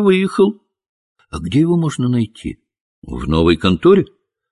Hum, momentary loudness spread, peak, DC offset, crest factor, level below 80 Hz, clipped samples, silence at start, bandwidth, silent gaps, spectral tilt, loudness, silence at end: none; 17 LU; -2 dBFS; under 0.1%; 16 dB; -34 dBFS; under 0.1%; 0 s; 11.5 kHz; 0.89-1.15 s, 2.81-3.02 s; -7 dB/octave; -15 LUFS; 0.45 s